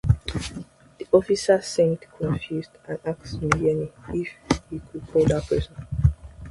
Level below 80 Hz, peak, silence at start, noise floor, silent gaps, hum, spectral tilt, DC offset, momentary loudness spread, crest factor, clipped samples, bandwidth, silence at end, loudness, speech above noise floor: -36 dBFS; -2 dBFS; 0.05 s; -42 dBFS; none; none; -6.5 dB/octave; under 0.1%; 14 LU; 22 dB; under 0.1%; 11.5 kHz; 0 s; -24 LUFS; 18 dB